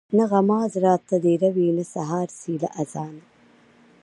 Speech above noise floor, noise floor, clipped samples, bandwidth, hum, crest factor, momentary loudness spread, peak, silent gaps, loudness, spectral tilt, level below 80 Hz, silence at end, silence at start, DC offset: 33 dB; -55 dBFS; under 0.1%; 11.5 kHz; none; 18 dB; 10 LU; -6 dBFS; none; -22 LUFS; -8 dB/octave; -70 dBFS; 0.8 s; 0.1 s; under 0.1%